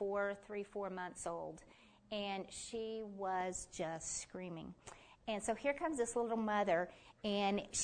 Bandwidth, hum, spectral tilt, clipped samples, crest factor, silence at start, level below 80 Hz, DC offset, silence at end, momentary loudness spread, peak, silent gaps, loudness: 9.6 kHz; none; -3.5 dB/octave; under 0.1%; 18 dB; 0 s; -68 dBFS; under 0.1%; 0 s; 12 LU; -24 dBFS; none; -41 LUFS